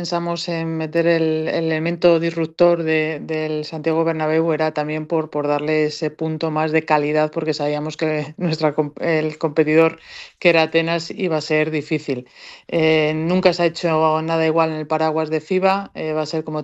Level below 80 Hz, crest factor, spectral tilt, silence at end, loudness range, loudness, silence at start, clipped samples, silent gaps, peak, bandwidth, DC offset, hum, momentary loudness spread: -60 dBFS; 18 dB; -6.5 dB/octave; 0 s; 2 LU; -19 LUFS; 0 s; under 0.1%; none; -2 dBFS; 8.2 kHz; under 0.1%; none; 7 LU